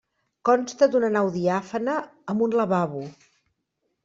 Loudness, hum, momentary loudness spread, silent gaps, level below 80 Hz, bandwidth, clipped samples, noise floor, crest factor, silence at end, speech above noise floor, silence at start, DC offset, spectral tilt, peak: -24 LUFS; none; 10 LU; none; -68 dBFS; 7.8 kHz; under 0.1%; -77 dBFS; 18 dB; 0.95 s; 54 dB; 0.45 s; under 0.1%; -6.5 dB/octave; -6 dBFS